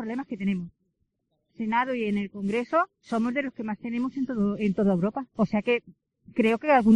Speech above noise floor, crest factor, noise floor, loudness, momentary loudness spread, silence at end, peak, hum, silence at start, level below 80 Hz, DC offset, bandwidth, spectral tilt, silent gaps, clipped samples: 50 dB; 20 dB; -76 dBFS; -27 LUFS; 8 LU; 0 s; -8 dBFS; none; 0 s; -62 dBFS; under 0.1%; 9.4 kHz; -8 dB/octave; none; under 0.1%